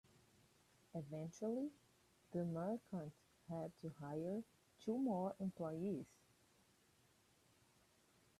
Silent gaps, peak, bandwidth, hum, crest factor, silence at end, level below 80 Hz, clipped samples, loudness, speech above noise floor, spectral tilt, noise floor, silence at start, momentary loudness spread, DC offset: none; -32 dBFS; 14 kHz; none; 16 dB; 2.35 s; -82 dBFS; under 0.1%; -47 LUFS; 30 dB; -8 dB/octave; -75 dBFS; 0.95 s; 10 LU; under 0.1%